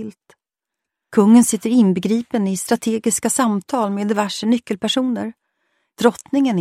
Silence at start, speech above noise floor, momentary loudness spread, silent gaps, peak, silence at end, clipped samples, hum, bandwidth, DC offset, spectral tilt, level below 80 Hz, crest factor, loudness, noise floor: 0 s; 67 dB; 9 LU; none; -2 dBFS; 0 s; under 0.1%; none; 15 kHz; under 0.1%; -4.5 dB/octave; -64 dBFS; 18 dB; -18 LUFS; -84 dBFS